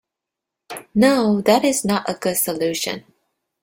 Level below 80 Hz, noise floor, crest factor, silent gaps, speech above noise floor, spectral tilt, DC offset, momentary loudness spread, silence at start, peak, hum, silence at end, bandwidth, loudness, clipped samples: -58 dBFS; -84 dBFS; 18 dB; none; 66 dB; -4 dB/octave; under 0.1%; 14 LU; 0.7 s; -2 dBFS; none; 0.6 s; 16.5 kHz; -19 LUFS; under 0.1%